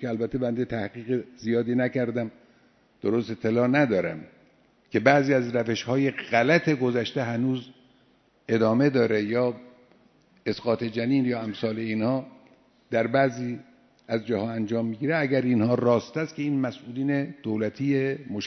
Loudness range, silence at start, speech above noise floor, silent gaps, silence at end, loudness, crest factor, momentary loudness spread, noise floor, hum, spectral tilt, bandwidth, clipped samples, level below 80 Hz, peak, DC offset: 4 LU; 0 s; 38 dB; none; 0 s; -26 LUFS; 24 dB; 10 LU; -62 dBFS; none; -7 dB/octave; 6.4 kHz; under 0.1%; -64 dBFS; -2 dBFS; under 0.1%